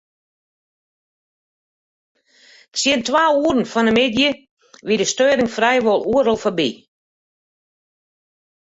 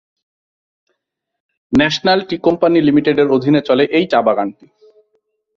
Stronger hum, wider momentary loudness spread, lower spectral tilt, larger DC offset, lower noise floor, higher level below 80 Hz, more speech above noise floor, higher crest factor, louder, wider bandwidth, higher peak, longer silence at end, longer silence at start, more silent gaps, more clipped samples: neither; about the same, 7 LU vs 5 LU; second, -3 dB/octave vs -6 dB/octave; neither; second, -50 dBFS vs -74 dBFS; second, -56 dBFS vs -48 dBFS; second, 34 dB vs 60 dB; about the same, 18 dB vs 16 dB; second, -17 LUFS vs -14 LUFS; first, 8.2 kHz vs 7.2 kHz; about the same, -2 dBFS vs 0 dBFS; first, 1.95 s vs 1.05 s; first, 2.75 s vs 1.7 s; first, 4.51-4.57 s vs none; neither